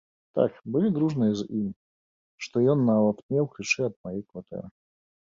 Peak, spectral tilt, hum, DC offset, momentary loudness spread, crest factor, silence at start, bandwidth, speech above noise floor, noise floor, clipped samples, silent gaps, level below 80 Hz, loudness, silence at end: -8 dBFS; -6.5 dB/octave; none; under 0.1%; 16 LU; 18 dB; 0.35 s; 7.6 kHz; over 64 dB; under -90 dBFS; under 0.1%; 1.76-2.38 s, 3.23-3.29 s, 3.96-4.04 s; -64 dBFS; -26 LUFS; 0.65 s